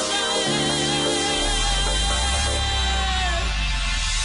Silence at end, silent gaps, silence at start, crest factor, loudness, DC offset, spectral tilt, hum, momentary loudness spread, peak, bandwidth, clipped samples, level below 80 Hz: 0 s; none; 0 s; 10 dB; -21 LUFS; under 0.1%; -2.5 dB/octave; none; 3 LU; -10 dBFS; 11 kHz; under 0.1%; -26 dBFS